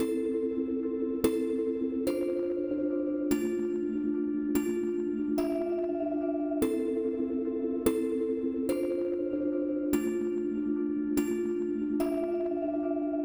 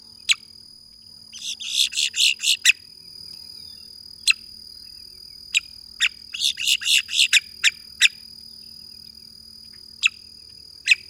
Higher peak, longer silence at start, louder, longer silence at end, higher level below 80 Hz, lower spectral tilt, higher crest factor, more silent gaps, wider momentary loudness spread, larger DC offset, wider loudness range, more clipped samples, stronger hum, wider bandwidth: second, -14 dBFS vs -2 dBFS; second, 0 s vs 0.25 s; second, -31 LUFS vs -20 LUFS; second, 0 s vs 0.15 s; about the same, -58 dBFS vs -62 dBFS; first, -6 dB/octave vs 4 dB/octave; second, 16 dB vs 24 dB; neither; second, 2 LU vs 24 LU; neither; second, 0 LU vs 6 LU; neither; neither; about the same, over 20 kHz vs over 20 kHz